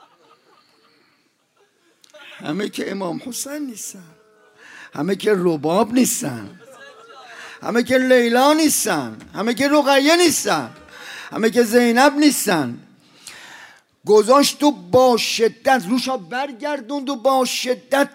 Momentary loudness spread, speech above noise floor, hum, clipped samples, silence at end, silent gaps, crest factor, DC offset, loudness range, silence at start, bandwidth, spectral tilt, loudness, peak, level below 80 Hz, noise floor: 19 LU; 45 dB; none; under 0.1%; 0.05 s; none; 16 dB; under 0.1%; 13 LU; 2.25 s; 16 kHz; -3.5 dB/octave; -18 LUFS; -2 dBFS; -64 dBFS; -62 dBFS